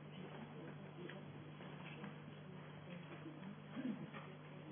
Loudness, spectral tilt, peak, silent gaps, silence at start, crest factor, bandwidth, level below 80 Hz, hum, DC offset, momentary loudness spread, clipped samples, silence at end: -53 LUFS; -5.5 dB/octave; -34 dBFS; none; 0 s; 18 dB; 3.5 kHz; -84 dBFS; 50 Hz at -60 dBFS; under 0.1%; 7 LU; under 0.1%; 0 s